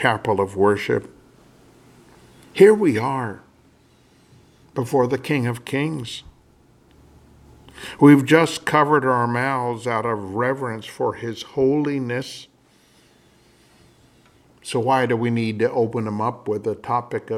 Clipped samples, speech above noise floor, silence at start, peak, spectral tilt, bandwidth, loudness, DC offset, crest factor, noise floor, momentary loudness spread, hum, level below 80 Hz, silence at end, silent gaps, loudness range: under 0.1%; 36 dB; 0 s; 0 dBFS; -6.5 dB/octave; 15 kHz; -20 LUFS; under 0.1%; 22 dB; -56 dBFS; 16 LU; none; -60 dBFS; 0 s; none; 8 LU